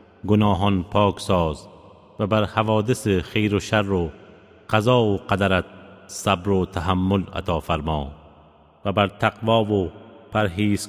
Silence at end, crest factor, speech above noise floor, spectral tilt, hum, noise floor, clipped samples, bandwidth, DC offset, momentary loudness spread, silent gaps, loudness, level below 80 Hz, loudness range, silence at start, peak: 0 s; 20 dB; 31 dB; -6 dB/octave; none; -52 dBFS; under 0.1%; 15.5 kHz; under 0.1%; 8 LU; none; -22 LUFS; -40 dBFS; 2 LU; 0.25 s; -2 dBFS